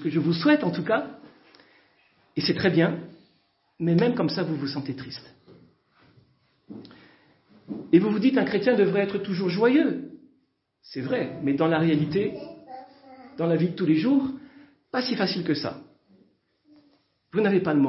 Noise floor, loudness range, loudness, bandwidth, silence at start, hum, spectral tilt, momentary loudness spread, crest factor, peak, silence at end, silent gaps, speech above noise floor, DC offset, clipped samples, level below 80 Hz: -70 dBFS; 6 LU; -24 LUFS; 5.8 kHz; 0 s; none; -10 dB/octave; 20 LU; 20 dB; -6 dBFS; 0 s; none; 46 dB; under 0.1%; under 0.1%; -66 dBFS